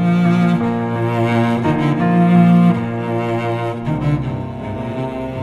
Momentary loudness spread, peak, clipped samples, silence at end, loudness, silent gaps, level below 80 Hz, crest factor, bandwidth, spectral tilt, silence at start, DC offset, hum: 12 LU; -2 dBFS; under 0.1%; 0 s; -16 LUFS; none; -42 dBFS; 14 dB; 7 kHz; -9 dB/octave; 0 s; under 0.1%; none